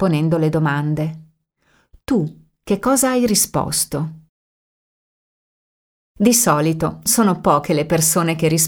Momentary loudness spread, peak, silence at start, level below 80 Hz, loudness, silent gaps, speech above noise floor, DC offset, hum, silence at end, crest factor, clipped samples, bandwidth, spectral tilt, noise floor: 9 LU; 0 dBFS; 0 s; -48 dBFS; -17 LUFS; 4.29-6.15 s; 44 dB; under 0.1%; none; 0 s; 18 dB; under 0.1%; over 20 kHz; -4.5 dB/octave; -61 dBFS